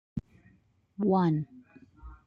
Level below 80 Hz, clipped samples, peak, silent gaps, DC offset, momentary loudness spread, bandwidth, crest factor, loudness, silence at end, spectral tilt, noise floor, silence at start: -56 dBFS; under 0.1%; -16 dBFS; none; under 0.1%; 18 LU; 5.4 kHz; 16 dB; -29 LUFS; 0.1 s; -10.5 dB/octave; -65 dBFS; 0.15 s